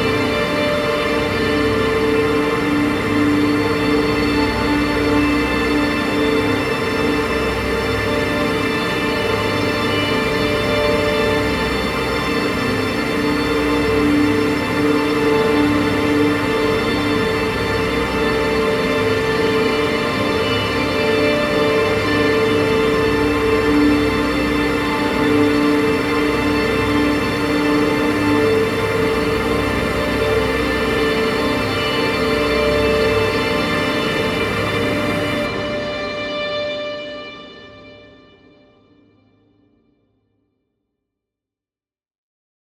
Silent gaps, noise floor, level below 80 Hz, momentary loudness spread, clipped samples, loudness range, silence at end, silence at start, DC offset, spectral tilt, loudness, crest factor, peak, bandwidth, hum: none; under -90 dBFS; -36 dBFS; 3 LU; under 0.1%; 3 LU; 4.7 s; 0 s; under 0.1%; -5.5 dB/octave; -17 LUFS; 14 dB; -4 dBFS; 16.5 kHz; none